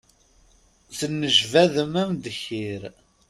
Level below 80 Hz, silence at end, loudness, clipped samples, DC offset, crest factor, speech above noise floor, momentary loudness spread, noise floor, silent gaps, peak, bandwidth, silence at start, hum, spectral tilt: -60 dBFS; 0.4 s; -22 LUFS; under 0.1%; under 0.1%; 22 dB; 35 dB; 18 LU; -58 dBFS; none; -4 dBFS; 14 kHz; 0.9 s; none; -4 dB/octave